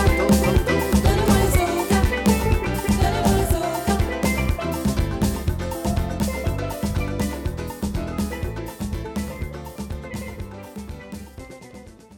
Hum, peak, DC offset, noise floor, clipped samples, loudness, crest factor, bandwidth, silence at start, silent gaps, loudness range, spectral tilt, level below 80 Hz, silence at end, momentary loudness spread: none; -4 dBFS; under 0.1%; -43 dBFS; under 0.1%; -22 LUFS; 18 dB; 18 kHz; 0 s; none; 11 LU; -5.5 dB/octave; -28 dBFS; 0 s; 18 LU